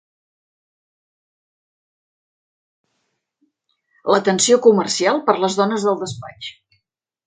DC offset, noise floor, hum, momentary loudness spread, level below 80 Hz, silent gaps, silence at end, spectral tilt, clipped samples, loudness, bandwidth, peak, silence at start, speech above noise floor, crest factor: under 0.1%; -75 dBFS; none; 18 LU; -66 dBFS; none; 0.75 s; -3.5 dB/octave; under 0.1%; -17 LUFS; 9.6 kHz; 0 dBFS; 4.05 s; 58 dB; 22 dB